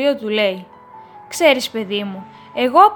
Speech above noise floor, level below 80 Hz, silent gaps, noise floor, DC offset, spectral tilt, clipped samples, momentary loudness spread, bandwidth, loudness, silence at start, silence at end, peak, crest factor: 24 dB; -68 dBFS; none; -40 dBFS; under 0.1%; -3.5 dB/octave; under 0.1%; 15 LU; 19 kHz; -17 LUFS; 0 s; 0 s; 0 dBFS; 18 dB